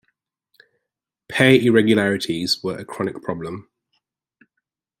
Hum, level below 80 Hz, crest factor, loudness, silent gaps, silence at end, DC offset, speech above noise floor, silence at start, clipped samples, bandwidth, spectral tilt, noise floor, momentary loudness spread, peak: none; -60 dBFS; 22 dB; -19 LUFS; none; 1.4 s; under 0.1%; 64 dB; 1.3 s; under 0.1%; 15 kHz; -5.5 dB/octave; -83 dBFS; 15 LU; 0 dBFS